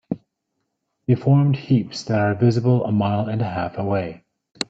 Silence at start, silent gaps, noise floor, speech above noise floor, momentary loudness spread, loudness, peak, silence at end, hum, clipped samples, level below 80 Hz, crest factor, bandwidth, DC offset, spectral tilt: 0.1 s; none; -76 dBFS; 57 dB; 11 LU; -20 LUFS; -2 dBFS; 0.05 s; none; under 0.1%; -58 dBFS; 18 dB; 8.6 kHz; under 0.1%; -7.5 dB/octave